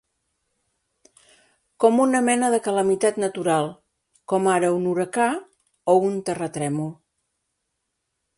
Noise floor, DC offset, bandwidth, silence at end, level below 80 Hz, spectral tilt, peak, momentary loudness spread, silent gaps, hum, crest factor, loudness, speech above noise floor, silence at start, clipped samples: -78 dBFS; under 0.1%; 11.5 kHz; 1.45 s; -68 dBFS; -5 dB/octave; -4 dBFS; 9 LU; none; none; 20 dB; -22 LUFS; 57 dB; 1.8 s; under 0.1%